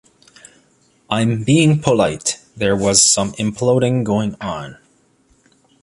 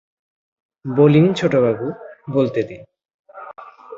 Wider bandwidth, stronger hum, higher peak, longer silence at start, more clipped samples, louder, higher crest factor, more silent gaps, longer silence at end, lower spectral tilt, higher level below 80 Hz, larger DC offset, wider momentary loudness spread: first, 11.5 kHz vs 7.6 kHz; neither; about the same, 0 dBFS vs -2 dBFS; first, 1.1 s vs 0.85 s; neither; about the same, -16 LUFS vs -17 LUFS; about the same, 18 dB vs 18 dB; second, none vs 3.05-3.24 s; first, 1.1 s vs 0 s; second, -4 dB/octave vs -8 dB/octave; first, -48 dBFS vs -58 dBFS; neither; second, 13 LU vs 24 LU